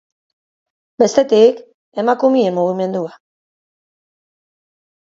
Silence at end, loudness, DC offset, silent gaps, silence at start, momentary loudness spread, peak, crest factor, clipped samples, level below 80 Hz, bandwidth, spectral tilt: 2.05 s; -15 LUFS; under 0.1%; 1.74-1.92 s; 1 s; 16 LU; 0 dBFS; 18 dB; under 0.1%; -66 dBFS; 7.8 kHz; -5.5 dB/octave